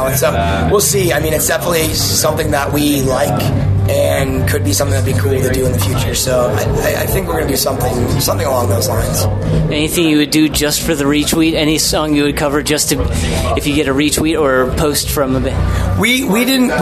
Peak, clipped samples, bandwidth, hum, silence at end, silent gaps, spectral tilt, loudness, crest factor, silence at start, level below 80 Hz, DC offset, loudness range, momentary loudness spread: -2 dBFS; under 0.1%; 14 kHz; none; 0 s; none; -4.5 dB/octave; -13 LUFS; 12 dB; 0 s; -26 dBFS; under 0.1%; 2 LU; 3 LU